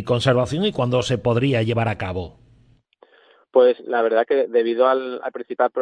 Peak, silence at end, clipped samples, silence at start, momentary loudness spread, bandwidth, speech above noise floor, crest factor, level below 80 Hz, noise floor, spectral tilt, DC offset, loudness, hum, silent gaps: -4 dBFS; 0 s; under 0.1%; 0 s; 12 LU; 10.5 kHz; 37 dB; 16 dB; -52 dBFS; -56 dBFS; -6.5 dB/octave; under 0.1%; -20 LUFS; none; none